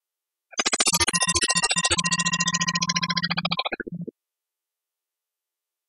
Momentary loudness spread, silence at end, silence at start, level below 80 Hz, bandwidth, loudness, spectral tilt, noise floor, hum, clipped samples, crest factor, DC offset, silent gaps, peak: 12 LU; 1.8 s; 0.55 s; -52 dBFS; 12.5 kHz; -22 LUFS; -1.5 dB/octave; -88 dBFS; none; under 0.1%; 22 dB; under 0.1%; none; -4 dBFS